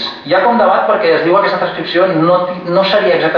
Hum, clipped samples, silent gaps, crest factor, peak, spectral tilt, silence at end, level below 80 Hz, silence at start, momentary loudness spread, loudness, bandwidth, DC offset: none; under 0.1%; none; 10 dB; 0 dBFS; -7 dB/octave; 0 s; -54 dBFS; 0 s; 4 LU; -12 LUFS; 5.4 kHz; under 0.1%